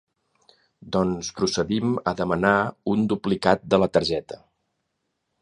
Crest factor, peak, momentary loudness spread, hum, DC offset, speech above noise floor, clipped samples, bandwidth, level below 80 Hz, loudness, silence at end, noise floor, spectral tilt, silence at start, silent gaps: 22 dB; -2 dBFS; 7 LU; none; under 0.1%; 54 dB; under 0.1%; 10.5 kHz; -52 dBFS; -23 LUFS; 1.05 s; -77 dBFS; -5.5 dB/octave; 0.85 s; none